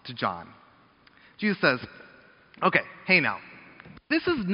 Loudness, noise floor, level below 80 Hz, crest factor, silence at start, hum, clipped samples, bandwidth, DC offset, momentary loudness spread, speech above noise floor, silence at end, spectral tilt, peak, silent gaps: -25 LUFS; -58 dBFS; -64 dBFS; 24 dB; 0.05 s; none; under 0.1%; 5.6 kHz; under 0.1%; 20 LU; 32 dB; 0 s; -3 dB/octave; -4 dBFS; none